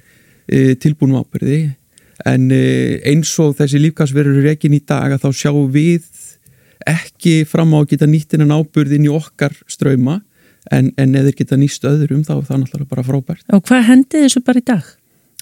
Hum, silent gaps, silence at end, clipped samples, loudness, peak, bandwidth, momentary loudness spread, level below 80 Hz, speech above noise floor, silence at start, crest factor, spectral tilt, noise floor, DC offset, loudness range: none; none; 0.6 s; under 0.1%; -13 LUFS; 0 dBFS; 16 kHz; 7 LU; -52 dBFS; 36 dB; 0.5 s; 14 dB; -6.5 dB/octave; -48 dBFS; under 0.1%; 2 LU